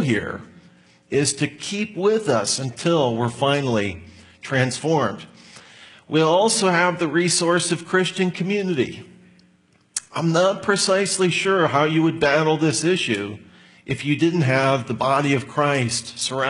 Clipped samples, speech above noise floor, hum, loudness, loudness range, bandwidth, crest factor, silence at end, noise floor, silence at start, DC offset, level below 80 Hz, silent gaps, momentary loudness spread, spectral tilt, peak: under 0.1%; 38 dB; none; -20 LUFS; 3 LU; 11 kHz; 18 dB; 0 s; -58 dBFS; 0 s; under 0.1%; -60 dBFS; none; 9 LU; -4.5 dB/octave; -2 dBFS